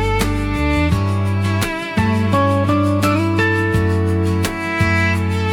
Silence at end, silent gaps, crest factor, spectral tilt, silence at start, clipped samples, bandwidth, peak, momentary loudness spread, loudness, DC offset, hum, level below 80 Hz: 0 s; none; 12 dB; -6.5 dB/octave; 0 s; under 0.1%; 16.5 kHz; -4 dBFS; 4 LU; -17 LUFS; under 0.1%; none; -30 dBFS